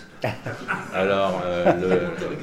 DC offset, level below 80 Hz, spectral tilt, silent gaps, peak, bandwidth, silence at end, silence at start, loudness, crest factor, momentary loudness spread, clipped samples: under 0.1%; -56 dBFS; -6.5 dB/octave; none; -6 dBFS; 15.5 kHz; 0 s; 0 s; -24 LUFS; 18 dB; 9 LU; under 0.1%